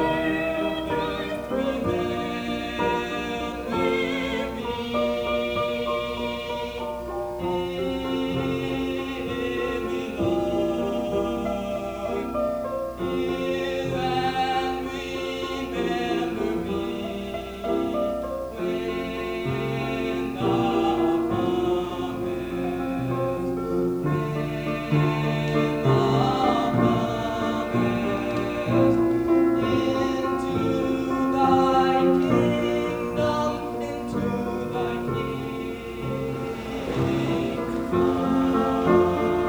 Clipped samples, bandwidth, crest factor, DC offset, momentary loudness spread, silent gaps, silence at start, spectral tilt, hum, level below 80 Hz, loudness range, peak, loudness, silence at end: under 0.1%; over 20 kHz; 18 dB; under 0.1%; 9 LU; none; 0 s; -6.5 dB/octave; none; -46 dBFS; 6 LU; -6 dBFS; -25 LUFS; 0 s